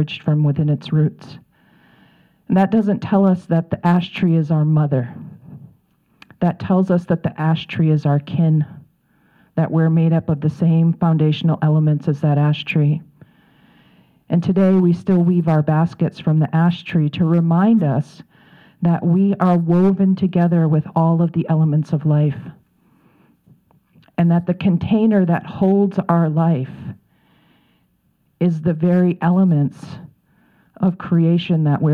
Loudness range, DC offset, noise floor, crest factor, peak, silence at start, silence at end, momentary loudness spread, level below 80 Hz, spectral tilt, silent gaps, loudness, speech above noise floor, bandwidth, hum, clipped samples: 4 LU; under 0.1%; -62 dBFS; 16 dB; -2 dBFS; 0 s; 0 s; 6 LU; -56 dBFS; -10 dB/octave; none; -17 LUFS; 46 dB; 4.9 kHz; none; under 0.1%